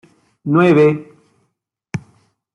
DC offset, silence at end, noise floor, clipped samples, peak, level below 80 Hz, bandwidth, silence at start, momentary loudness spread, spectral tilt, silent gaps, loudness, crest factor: under 0.1%; 0.55 s; -71 dBFS; under 0.1%; -2 dBFS; -58 dBFS; 10 kHz; 0.45 s; 18 LU; -8.5 dB/octave; none; -14 LUFS; 16 dB